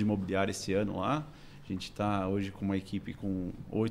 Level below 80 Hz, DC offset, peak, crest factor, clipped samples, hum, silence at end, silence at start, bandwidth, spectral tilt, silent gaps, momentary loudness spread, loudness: -54 dBFS; under 0.1%; -16 dBFS; 18 dB; under 0.1%; none; 0 s; 0 s; 14.5 kHz; -6 dB/octave; none; 9 LU; -34 LUFS